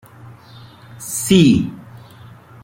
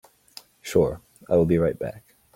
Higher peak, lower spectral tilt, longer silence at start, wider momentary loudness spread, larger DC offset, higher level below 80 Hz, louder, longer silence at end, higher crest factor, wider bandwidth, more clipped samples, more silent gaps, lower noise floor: first, -2 dBFS vs -6 dBFS; second, -5 dB/octave vs -7 dB/octave; second, 0.25 s vs 0.65 s; first, 21 LU vs 16 LU; neither; about the same, -48 dBFS vs -50 dBFS; first, -15 LUFS vs -24 LUFS; first, 0.85 s vs 0.35 s; about the same, 18 dB vs 18 dB; about the same, 16.5 kHz vs 16.5 kHz; neither; neither; second, -41 dBFS vs -49 dBFS